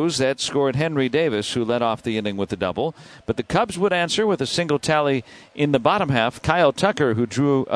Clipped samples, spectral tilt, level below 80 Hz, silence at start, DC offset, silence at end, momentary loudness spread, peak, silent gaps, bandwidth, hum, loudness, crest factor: under 0.1%; -5 dB/octave; -50 dBFS; 0 s; under 0.1%; 0 s; 7 LU; -4 dBFS; none; 11 kHz; none; -21 LUFS; 18 dB